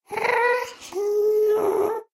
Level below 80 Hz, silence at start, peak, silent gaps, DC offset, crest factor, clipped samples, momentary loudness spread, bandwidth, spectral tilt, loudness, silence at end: -70 dBFS; 0.1 s; -8 dBFS; none; under 0.1%; 14 dB; under 0.1%; 7 LU; 15 kHz; -3.5 dB/octave; -22 LUFS; 0.1 s